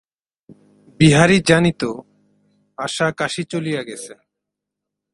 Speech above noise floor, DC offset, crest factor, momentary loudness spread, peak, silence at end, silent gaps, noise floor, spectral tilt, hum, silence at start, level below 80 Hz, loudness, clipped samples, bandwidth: 65 dB; under 0.1%; 20 dB; 20 LU; 0 dBFS; 1 s; none; -82 dBFS; -5 dB/octave; none; 1 s; -50 dBFS; -17 LUFS; under 0.1%; 11.5 kHz